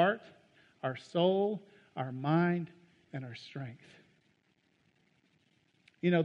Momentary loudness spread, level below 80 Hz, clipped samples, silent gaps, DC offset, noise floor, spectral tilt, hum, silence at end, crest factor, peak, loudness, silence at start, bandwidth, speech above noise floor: 16 LU; -80 dBFS; under 0.1%; none; under 0.1%; -73 dBFS; -8 dB/octave; none; 0 s; 20 dB; -14 dBFS; -34 LUFS; 0 s; 7.4 kHz; 40 dB